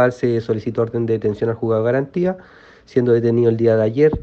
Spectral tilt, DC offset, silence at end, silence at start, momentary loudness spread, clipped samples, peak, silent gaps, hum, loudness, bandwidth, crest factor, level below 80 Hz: -9 dB/octave; under 0.1%; 0 s; 0 s; 7 LU; under 0.1%; -2 dBFS; none; none; -18 LUFS; 7.2 kHz; 14 dB; -46 dBFS